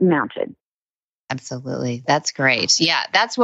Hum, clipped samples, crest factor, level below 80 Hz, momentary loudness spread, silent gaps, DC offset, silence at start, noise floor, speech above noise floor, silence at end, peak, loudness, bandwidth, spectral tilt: none; under 0.1%; 18 dB; -66 dBFS; 14 LU; 0.60-1.27 s; under 0.1%; 0 s; under -90 dBFS; over 70 dB; 0 s; -4 dBFS; -19 LUFS; 8.2 kHz; -3 dB/octave